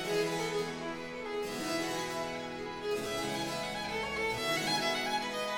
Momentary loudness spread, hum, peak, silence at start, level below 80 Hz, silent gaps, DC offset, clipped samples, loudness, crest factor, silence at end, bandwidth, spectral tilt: 8 LU; none; -20 dBFS; 0 s; -60 dBFS; none; under 0.1%; under 0.1%; -34 LUFS; 16 dB; 0 s; 19 kHz; -3 dB/octave